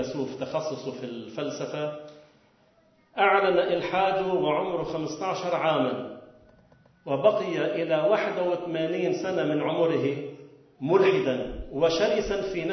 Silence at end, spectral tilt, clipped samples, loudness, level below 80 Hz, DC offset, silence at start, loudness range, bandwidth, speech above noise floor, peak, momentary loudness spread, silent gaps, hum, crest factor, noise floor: 0 s; -5.5 dB/octave; under 0.1%; -26 LUFS; -54 dBFS; under 0.1%; 0 s; 3 LU; 6.4 kHz; 37 dB; -8 dBFS; 13 LU; none; none; 20 dB; -62 dBFS